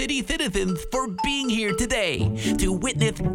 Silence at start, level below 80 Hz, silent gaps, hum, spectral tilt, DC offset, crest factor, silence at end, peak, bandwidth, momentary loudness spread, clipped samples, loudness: 0 s; -36 dBFS; none; none; -4 dB/octave; under 0.1%; 16 dB; 0 s; -8 dBFS; 19.5 kHz; 3 LU; under 0.1%; -24 LUFS